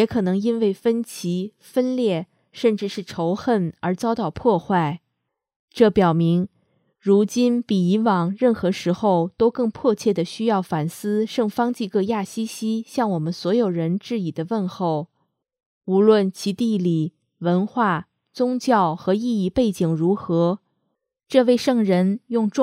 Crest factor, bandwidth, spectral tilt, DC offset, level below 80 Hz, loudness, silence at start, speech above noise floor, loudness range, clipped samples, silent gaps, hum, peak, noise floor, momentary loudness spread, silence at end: 20 dB; 15 kHz; -7 dB/octave; under 0.1%; -58 dBFS; -21 LUFS; 0 s; 58 dB; 3 LU; under 0.1%; 5.56-5.68 s, 15.66-15.81 s; none; -2 dBFS; -78 dBFS; 8 LU; 0 s